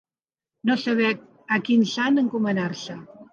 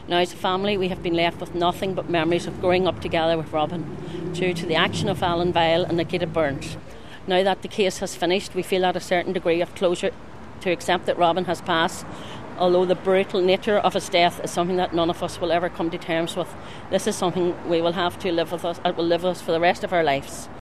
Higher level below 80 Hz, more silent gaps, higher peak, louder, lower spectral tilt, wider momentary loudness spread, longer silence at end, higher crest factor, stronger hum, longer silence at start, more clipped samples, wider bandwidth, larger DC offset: second, -74 dBFS vs -50 dBFS; neither; second, -8 dBFS vs -4 dBFS; about the same, -23 LUFS vs -23 LUFS; about the same, -5.5 dB/octave vs -5 dB/octave; first, 13 LU vs 9 LU; about the same, 0.1 s vs 0 s; about the same, 16 dB vs 18 dB; neither; first, 0.65 s vs 0 s; neither; second, 7.4 kHz vs 14 kHz; second, under 0.1% vs 0.9%